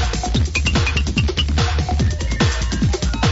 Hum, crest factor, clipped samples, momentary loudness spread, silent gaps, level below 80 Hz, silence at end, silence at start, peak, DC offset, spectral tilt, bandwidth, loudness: none; 14 dB; under 0.1%; 2 LU; none; -22 dBFS; 0 s; 0 s; -4 dBFS; under 0.1%; -4.5 dB/octave; 8 kHz; -19 LUFS